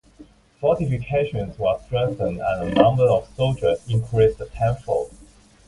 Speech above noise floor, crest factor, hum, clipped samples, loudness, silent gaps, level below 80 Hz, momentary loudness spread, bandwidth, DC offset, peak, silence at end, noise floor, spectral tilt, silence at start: 29 dB; 22 dB; none; under 0.1%; -22 LUFS; none; -42 dBFS; 7 LU; 11.5 kHz; under 0.1%; 0 dBFS; 0.45 s; -49 dBFS; -7.5 dB/octave; 0.2 s